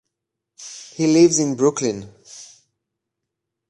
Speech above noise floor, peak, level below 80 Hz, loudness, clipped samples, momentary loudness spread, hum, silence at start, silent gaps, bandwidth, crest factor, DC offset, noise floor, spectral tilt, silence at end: 65 dB; -2 dBFS; -64 dBFS; -17 LUFS; under 0.1%; 25 LU; none; 0.6 s; none; 10.5 kHz; 20 dB; under 0.1%; -82 dBFS; -4.5 dB/octave; 1.25 s